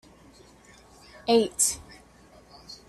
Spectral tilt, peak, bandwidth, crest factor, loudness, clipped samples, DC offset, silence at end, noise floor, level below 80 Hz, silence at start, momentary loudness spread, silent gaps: -2 dB/octave; -8 dBFS; 14 kHz; 22 dB; -24 LUFS; under 0.1%; under 0.1%; 0.15 s; -54 dBFS; -58 dBFS; 1.25 s; 17 LU; none